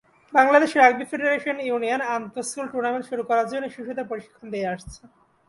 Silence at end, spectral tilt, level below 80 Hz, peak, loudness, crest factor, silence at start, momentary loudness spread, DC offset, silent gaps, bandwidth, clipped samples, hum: 0.55 s; -4 dB/octave; -60 dBFS; -2 dBFS; -23 LUFS; 22 dB; 0.3 s; 15 LU; under 0.1%; none; 11.5 kHz; under 0.1%; none